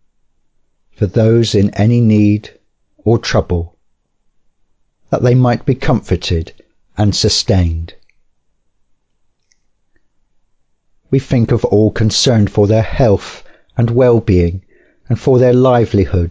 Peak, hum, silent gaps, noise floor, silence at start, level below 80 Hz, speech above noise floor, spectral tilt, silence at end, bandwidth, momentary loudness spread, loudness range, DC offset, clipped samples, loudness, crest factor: -2 dBFS; none; none; -60 dBFS; 1 s; -28 dBFS; 48 dB; -6.5 dB/octave; 0 s; 8 kHz; 10 LU; 6 LU; under 0.1%; under 0.1%; -13 LUFS; 12 dB